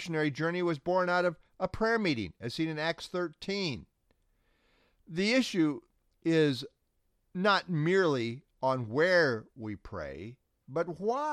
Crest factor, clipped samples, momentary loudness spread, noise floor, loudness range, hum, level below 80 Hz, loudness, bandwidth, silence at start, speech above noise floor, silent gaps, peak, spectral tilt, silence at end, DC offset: 18 dB; under 0.1%; 14 LU; -75 dBFS; 4 LU; none; -62 dBFS; -31 LUFS; 13 kHz; 0 s; 45 dB; none; -12 dBFS; -5.5 dB/octave; 0 s; under 0.1%